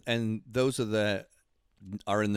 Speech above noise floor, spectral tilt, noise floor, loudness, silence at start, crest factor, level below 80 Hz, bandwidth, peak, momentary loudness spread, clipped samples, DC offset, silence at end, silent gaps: 36 dB; -5.5 dB/octave; -66 dBFS; -30 LUFS; 0.05 s; 16 dB; -64 dBFS; 15 kHz; -14 dBFS; 10 LU; under 0.1%; under 0.1%; 0 s; none